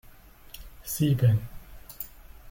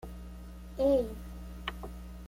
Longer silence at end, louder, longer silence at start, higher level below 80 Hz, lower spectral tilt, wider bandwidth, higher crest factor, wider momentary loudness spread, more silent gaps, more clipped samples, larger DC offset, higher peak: about the same, 0 s vs 0 s; first, -26 LUFS vs -32 LUFS; first, 0.55 s vs 0 s; about the same, -48 dBFS vs -44 dBFS; about the same, -6.5 dB/octave vs -6.5 dB/octave; about the same, 17 kHz vs 16.5 kHz; about the same, 18 dB vs 18 dB; first, 24 LU vs 19 LU; neither; neither; neither; first, -12 dBFS vs -16 dBFS